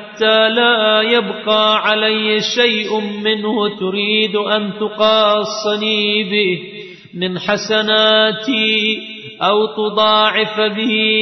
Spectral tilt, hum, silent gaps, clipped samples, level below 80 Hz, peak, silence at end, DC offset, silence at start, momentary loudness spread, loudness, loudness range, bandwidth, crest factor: -4 dB/octave; none; none; under 0.1%; -64 dBFS; -2 dBFS; 0 s; under 0.1%; 0 s; 8 LU; -14 LUFS; 2 LU; 6.4 kHz; 14 dB